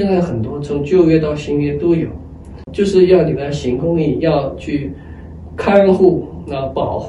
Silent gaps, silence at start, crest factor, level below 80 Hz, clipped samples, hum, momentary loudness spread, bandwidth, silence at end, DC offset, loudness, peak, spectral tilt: none; 0 s; 16 dB; -38 dBFS; under 0.1%; none; 18 LU; 9.8 kHz; 0 s; under 0.1%; -15 LUFS; 0 dBFS; -8 dB/octave